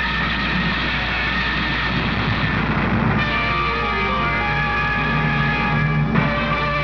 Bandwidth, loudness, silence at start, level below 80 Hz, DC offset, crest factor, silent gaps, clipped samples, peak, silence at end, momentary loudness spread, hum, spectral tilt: 5.4 kHz; -19 LUFS; 0 s; -30 dBFS; 0.4%; 16 dB; none; under 0.1%; -4 dBFS; 0 s; 1 LU; none; -7 dB/octave